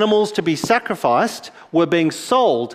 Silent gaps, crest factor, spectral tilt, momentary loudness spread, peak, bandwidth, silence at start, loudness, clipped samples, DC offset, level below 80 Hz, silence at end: none; 16 dB; -4.5 dB/octave; 6 LU; -2 dBFS; 15.5 kHz; 0 s; -18 LUFS; under 0.1%; under 0.1%; -60 dBFS; 0 s